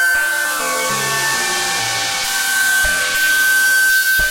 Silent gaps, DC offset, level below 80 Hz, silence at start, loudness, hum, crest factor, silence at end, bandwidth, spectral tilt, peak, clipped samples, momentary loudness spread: none; under 0.1%; -40 dBFS; 0 s; -14 LUFS; none; 10 dB; 0 s; 16.5 kHz; 0.5 dB/octave; -6 dBFS; under 0.1%; 5 LU